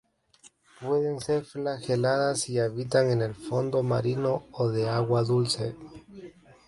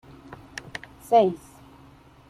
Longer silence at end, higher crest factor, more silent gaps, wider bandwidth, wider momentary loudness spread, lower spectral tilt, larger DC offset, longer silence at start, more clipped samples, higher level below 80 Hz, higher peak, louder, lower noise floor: second, 0.35 s vs 0.95 s; about the same, 16 dB vs 20 dB; neither; second, 11.5 kHz vs 14 kHz; second, 13 LU vs 24 LU; about the same, -5.5 dB/octave vs -5.5 dB/octave; neither; second, 0.45 s vs 1.1 s; neither; about the same, -62 dBFS vs -58 dBFS; second, -12 dBFS vs -8 dBFS; second, -27 LUFS vs -22 LUFS; first, -59 dBFS vs -52 dBFS